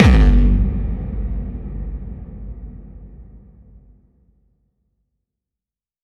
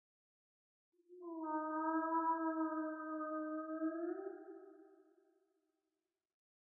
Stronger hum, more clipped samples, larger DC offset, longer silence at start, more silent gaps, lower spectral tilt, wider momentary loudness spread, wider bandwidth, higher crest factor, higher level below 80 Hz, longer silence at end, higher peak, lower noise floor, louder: neither; neither; neither; second, 0 s vs 1.1 s; neither; first, -8 dB/octave vs 11 dB/octave; first, 26 LU vs 17 LU; first, 6.6 kHz vs 1.9 kHz; about the same, 20 dB vs 16 dB; first, -20 dBFS vs under -90 dBFS; first, 2.65 s vs 1.75 s; first, 0 dBFS vs -26 dBFS; about the same, -88 dBFS vs under -90 dBFS; first, -20 LUFS vs -41 LUFS